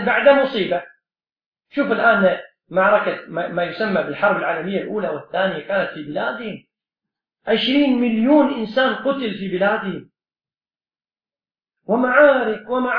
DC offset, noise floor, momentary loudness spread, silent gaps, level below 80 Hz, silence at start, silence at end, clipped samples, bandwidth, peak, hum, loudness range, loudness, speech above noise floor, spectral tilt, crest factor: under 0.1%; under -90 dBFS; 11 LU; 1.46-1.52 s; -60 dBFS; 0 s; 0 s; under 0.1%; 5.2 kHz; -2 dBFS; none; 5 LU; -19 LUFS; over 72 dB; -8 dB/octave; 18 dB